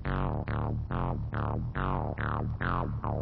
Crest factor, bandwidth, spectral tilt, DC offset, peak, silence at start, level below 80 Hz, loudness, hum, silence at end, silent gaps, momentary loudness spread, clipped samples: 16 dB; 4.9 kHz; -11 dB/octave; under 0.1%; -16 dBFS; 0 s; -38 dBFS; -33 LUFS; none; 0 s; none; 2 LU; under 0.1%